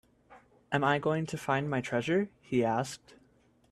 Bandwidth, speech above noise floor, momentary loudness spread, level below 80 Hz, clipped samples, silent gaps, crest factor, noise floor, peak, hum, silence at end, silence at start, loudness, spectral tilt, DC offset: 13.5 kHz; 35 dB; 6 LU; -66 dBFS; under 0.1%; none; 20 dB; -65 dBFS; -12 dBFS; none; 0.75 s; 0.3 s; -31 LUFS; -6 dB/octave; under 0.1%